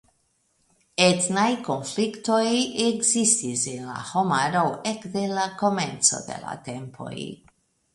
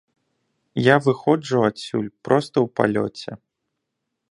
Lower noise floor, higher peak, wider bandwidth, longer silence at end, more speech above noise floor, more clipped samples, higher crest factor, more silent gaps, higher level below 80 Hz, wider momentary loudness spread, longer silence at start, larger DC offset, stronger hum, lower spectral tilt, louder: second, -69 dBFS vs -79 dBFS; about the same, -2 dBFS vs 0 dBFS; about the same, 11.5 kHz vs 11 kHz; second, 0.6 s vs 0.95 s; second, 45 dB vs 59 dB; neither; about the same, 22 dB vs 22 dB; neither; about the same, -66 dBFS vs -62 dBFS; first, 15 LU vs 12 LU; first, 1 s vs 0.75 s; neither; neither; second, -3 dB/octave vs -6.5 dB/octave; about the same, -23 LUFS vs -21 LUFS